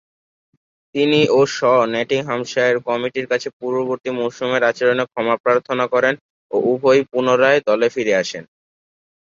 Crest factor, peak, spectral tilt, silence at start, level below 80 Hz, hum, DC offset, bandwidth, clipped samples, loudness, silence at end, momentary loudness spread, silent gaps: 16 dB; -2 dBFS; -4.5 dB/octave; 0.95 s; -64 dBFS; none; under 0.1%; 7.6 kHz; under 0.1%; -18 LUFS; 0.85 s; 8 LU; 3.53-3.60 s, 5.40-5.44 s, 6.21-6.50 s